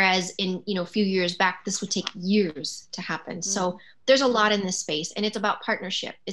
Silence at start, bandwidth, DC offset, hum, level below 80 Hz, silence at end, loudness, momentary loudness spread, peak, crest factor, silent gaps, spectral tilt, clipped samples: 0 s; 12 kHz; 0.2%; none; -74 dBFS; 0 s; -25 LUFS; 10 LU; -6 dBFS; 20 dB; none; -3.5 dB/octave; under 0.1%